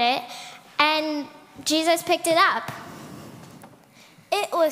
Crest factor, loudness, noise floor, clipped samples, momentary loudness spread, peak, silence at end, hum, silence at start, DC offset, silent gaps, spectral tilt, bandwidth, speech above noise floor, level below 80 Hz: 22 dB; -22 LUFS; -52 dBFS; under 0.1%; 21 LU; -2 dBFS; 0 s; none; 0 s; under 0.1%; none; -2 dB/octave; 16 kHz; 29 dB; -70 dBFS